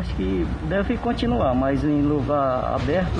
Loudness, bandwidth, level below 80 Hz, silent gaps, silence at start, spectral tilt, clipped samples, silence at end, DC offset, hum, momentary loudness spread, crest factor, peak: -22 LUFS; 9.8 kHz; -32 dBFS; none; 0 s; -8 dB/octave; under 0.1%; 0 s; under 0.1%; none; 4 LU; 12 dB; -10 dBFS